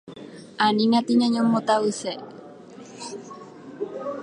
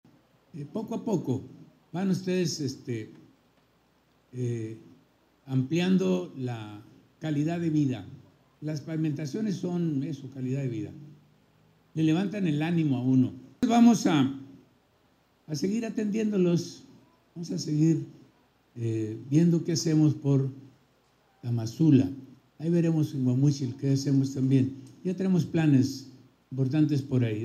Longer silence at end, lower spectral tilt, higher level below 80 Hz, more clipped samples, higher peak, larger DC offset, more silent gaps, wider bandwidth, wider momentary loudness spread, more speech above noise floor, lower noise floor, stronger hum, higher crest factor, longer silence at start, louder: about the same, 0 s vs 0 s; second, -5 dB/octave vs -7 dB/octave; about the same, -74 dBFS vs -74 dBFS; neither; about the same, -6 dBFS vs -8 dBFS; neither; neither; second, 10.5 kHz vs 13 kHz; first, 23 LU vs 16 LU; second, 22 dB vs 40 dB; second, -43 dBFS vs -66 dBFS; neither; about the same, 18 dB vs 20 dB; second, 0.05 s vs 0.55 s; first, -22 LUFS vs -27 LUFS